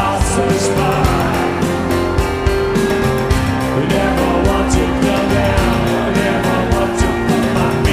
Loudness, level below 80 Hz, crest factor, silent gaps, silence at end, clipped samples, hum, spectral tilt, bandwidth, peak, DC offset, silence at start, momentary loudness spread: -15 LUFS; -24 dBFS; 14 dB; none; 0 s; under 0.1%; none; -5.5 dB/octave; 15.5 kHz; -2 dBFS; 0.3%; 0 s; 2 LU